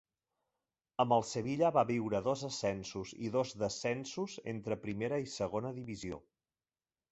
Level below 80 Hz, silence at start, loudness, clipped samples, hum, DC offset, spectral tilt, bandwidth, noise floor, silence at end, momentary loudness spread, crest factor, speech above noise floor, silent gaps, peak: -66 dBFS; 1 s; -36 LUFS; under 0.1%; none; under 0.1%; -5 dB/octave; 8 kHz; under -90 dBFS; 0.9 s; 12 LU; 20 dB; over 55 dB; none; -16 dBFS